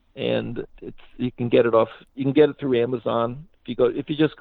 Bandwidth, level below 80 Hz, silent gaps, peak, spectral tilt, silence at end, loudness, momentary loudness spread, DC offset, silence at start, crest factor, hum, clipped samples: 4.6 kHz; -52 dBFS; none; -4 dBFS; -10 dB/octave; 0.05 s; -22 LUFS; 16 LU; under 0.1%; 0.15 s; 18 dB; none; under 0.1%